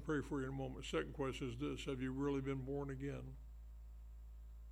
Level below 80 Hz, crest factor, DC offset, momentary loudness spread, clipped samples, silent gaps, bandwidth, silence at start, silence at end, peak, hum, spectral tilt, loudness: -54 dBFS; 16 dB; under 0.1%; 17 LU; under 0.1%; none; 15.5 kHz; 0 s; 0 s; -28 dBFS; none; -6.5 dB/octave; -44 LUFS